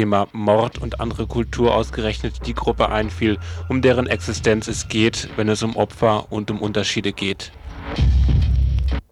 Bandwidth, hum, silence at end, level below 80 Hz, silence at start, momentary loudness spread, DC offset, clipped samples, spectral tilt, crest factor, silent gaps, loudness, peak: 11.5 kHz; none; 0.1 s; -26 dBFS; 0 s; 8 LU; under 0.1%; under 0.1%; -5.5 dB/octave; 16 dB; none; -20 LUFS; -2 dBFS